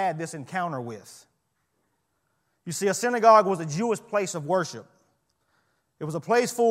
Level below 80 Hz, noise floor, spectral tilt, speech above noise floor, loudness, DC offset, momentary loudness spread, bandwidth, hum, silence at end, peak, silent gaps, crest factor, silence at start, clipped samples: -76 dBFS; -74 dBFS; -4.5 dB/octave; 50 dB; -25 LUFS; under 0.1%; 20 LU; 16 kHz; none; 0 s; -6 dBFS; none; 22 dB; 0 s; under 0.1%